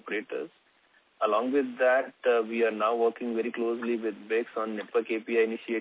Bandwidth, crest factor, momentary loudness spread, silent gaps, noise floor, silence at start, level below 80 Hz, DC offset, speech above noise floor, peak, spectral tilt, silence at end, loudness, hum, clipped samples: 4 kHz; 16 dB; 8 LU; none; -65 dBFS; 0.05 s; -86 dBFS; under 0.1%; 37 dB; -12 dBFS; -8.5 dB/octave; 0 s; -28 LUFS; none; under 0.1%